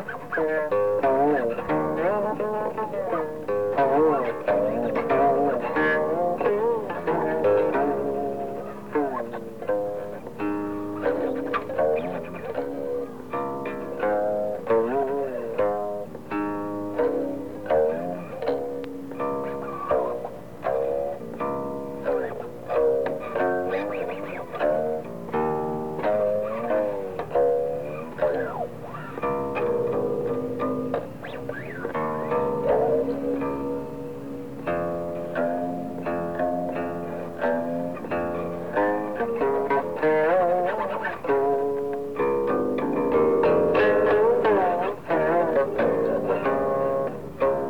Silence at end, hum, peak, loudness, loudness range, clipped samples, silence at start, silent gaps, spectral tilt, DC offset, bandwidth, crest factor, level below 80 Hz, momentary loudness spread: 0 s; none; -12 dBFS; -26 LUFS; 6 LU; under 0.1%; 0 s; none; -7.5 dB/octave; 0.6%; 19.5 kHz; 14 dB; -56 dBFS; 11 LU